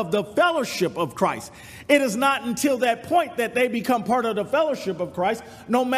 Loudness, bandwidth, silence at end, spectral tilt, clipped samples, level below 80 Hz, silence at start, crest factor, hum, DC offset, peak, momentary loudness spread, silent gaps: -23 LUFS; 15.5 kHz; 0 s; -4 dB/octave; under 0.1%; -62 dBFS; 0 s; 18 dB; none; under 0.1%; -4 dBFS; 6 LU; none